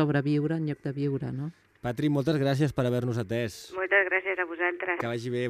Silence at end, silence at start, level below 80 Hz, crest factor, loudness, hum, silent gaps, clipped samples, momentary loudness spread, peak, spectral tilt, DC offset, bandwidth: 0 s; 0 s; -60 dBFS; 18 dB; -28 LUFS; none; none; under 0.1%; 10 LU; -10 dBFS; -7 dB/octave; under 0.1%; 14.5 kHz